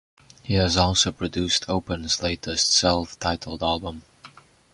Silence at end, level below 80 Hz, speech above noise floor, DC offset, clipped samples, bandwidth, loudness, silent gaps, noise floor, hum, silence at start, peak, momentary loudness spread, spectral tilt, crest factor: 0.45 s; -40 dBFS; 26 dB; under 0.1%; under 0.1%; 11 kHz; -22 LUFS; none; -50 dBFS; none; 0.45 s; -4 dBFS; 9 LU; -3.5 dB/octave; 20 dB